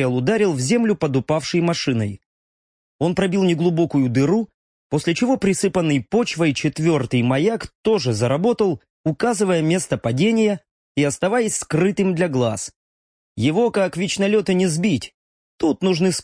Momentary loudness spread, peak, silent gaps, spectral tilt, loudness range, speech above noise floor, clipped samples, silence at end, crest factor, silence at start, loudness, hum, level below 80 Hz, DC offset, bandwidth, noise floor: 6 LU; -6 dBFS; 2.26-2.99 s, 4.54-4.90 s, 7.75-7.84 s, 8.90-9.04 s, 10.71-10.95 s, 12.76-13.35 s, 15.14-15.58 s; -5.5 dB/octave; 2 LU; over 71 dB; under 0.1%; 0 s; 14 dB; 0 s; -20 LUFS; none; -54 dBFS; under 0.1%; 10.5 kHz; under -90 dBFS